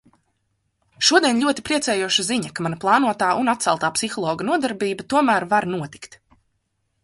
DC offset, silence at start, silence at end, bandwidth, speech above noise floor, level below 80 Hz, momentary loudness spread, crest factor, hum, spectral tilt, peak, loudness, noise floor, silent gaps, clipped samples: under 0.1%; 1 s; 1 s; 11.5 kHz; 51 dB; -60 dBFS; 9 LU; 20 dB; none; -3 dB/octave; -2 dBFS; -20 LUFS; -72 dBFS; none; under 0.1%